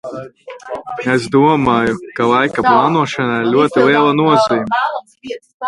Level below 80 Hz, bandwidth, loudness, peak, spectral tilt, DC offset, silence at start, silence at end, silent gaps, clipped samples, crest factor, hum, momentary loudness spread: -50 dBFS; 11.5 kHz; -13 LUFS; 0 dBFS; -6 dB/octave; under 0.1%; 0.05 s; 0 s; 5.54-5.60 s; under 0.1%; 14 dB; none; 18 LU